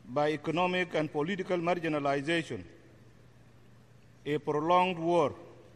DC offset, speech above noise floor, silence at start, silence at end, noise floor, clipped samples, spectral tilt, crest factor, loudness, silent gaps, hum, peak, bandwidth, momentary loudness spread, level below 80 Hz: under 0.1%; 28 dB; 0.05 s; 0.15 s; -58 dBFS; under 0.1%; -6 dB/octave; 18 dB; -30 LUFS; none; none; -14 dBFS; 10.5 kHz; 9 LU; -68 dBFS